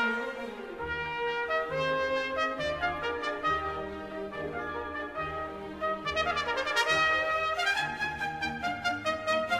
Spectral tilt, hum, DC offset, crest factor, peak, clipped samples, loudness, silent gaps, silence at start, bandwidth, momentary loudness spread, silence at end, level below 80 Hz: -3.5 dB/octave; none; under 0.1%; 18 dB; -12 dBFS; under 0.1%; -31 LUFS; none; 0 s; 15 kHz; 10 LU; 0 s; -54 dBFS